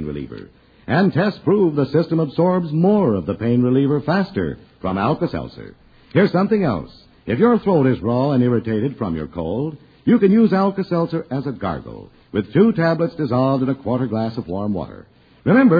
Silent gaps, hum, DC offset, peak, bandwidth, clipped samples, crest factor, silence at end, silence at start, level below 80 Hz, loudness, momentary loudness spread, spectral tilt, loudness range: none; none; under 0.1%; -2 dBFS; 5 kHz; under 0.1%; 16 dB; 0 s; 0 s; -48 dBFS; -19 LUFS; 13 LU; -10.5 dB/octave; 2 LU